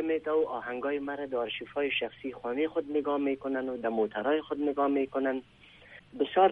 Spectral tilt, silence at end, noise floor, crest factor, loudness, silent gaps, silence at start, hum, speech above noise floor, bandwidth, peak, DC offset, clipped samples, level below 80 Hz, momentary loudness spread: -7 dB/octave; 0 s; -53 dBFS; 20 dB; -31 LUFS; none; 0 s; none; 23 dB; 4.4 kHz; -10 dBFS; under 0.1%; under 0.1%; -68 dBFS; 6 LU